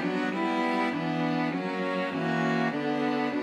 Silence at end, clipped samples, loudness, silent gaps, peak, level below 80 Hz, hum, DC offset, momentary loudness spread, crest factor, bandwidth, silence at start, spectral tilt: 0 s; under 0.1%; -28 LUFS; none; -14 dBFS; -78 dBFS; none; under 0.1%; 3 LU; 14 dB; 11.5 kHz; 0 s; -6.5 dB/octave